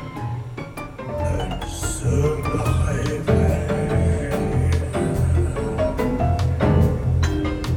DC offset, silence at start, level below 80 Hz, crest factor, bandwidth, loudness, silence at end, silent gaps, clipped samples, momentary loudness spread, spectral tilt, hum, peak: under 0.1%; 0 s; -28 dBFS; 16 dB; 15.5 kHz; -22 LUFS; 0 s; none; under 0.1%; 10 LU; -7 dB/octave; none; -6 dBFS